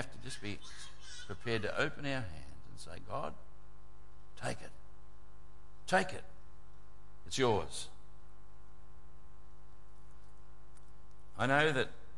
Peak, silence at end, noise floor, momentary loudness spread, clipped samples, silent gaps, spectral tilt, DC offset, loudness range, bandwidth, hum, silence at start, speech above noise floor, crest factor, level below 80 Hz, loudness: -16 dBFS; 0 s; -59 dBFS; 21 LU; under 0.1%; none; -4.5 dB/octave; 1%; 9 LU; 11.5 kHz; none; 0 s; 23 dB; 24 dB; -60 dBFS; -36 LUFS